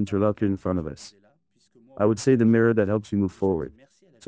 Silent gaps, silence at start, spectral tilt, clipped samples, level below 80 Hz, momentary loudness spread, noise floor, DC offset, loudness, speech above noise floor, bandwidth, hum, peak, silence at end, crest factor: none; 0 s; -7.5 dB/octave; under 0.1%; -48 dBFS; 12 LU; -64 dBFS; under 0.1%; -23 LUFS; 42 dB; 8 kHz; none; -8 dBFS; 0.55 s; 16 dB